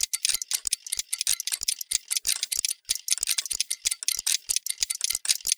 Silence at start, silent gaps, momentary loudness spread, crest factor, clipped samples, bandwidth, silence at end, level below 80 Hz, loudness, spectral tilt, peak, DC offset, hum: 0 s; none; 3 LU; 24 dB; under 0.1%; over 20 kHz; 0.05 s; -62 dBFS; -26 LUFS; 4.5 dB/octave; -4 dBFS; under 0.1%; none